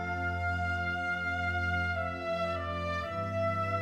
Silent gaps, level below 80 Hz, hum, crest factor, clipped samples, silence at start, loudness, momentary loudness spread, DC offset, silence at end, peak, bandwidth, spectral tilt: none; -56 dBFS; none; 12 dB; under 0.1%; 0 s; -32 LUFS; 3 LU; under 0.1%; 0 s; -20 dBFS; 9.6 kHz; -6.5 dB/octave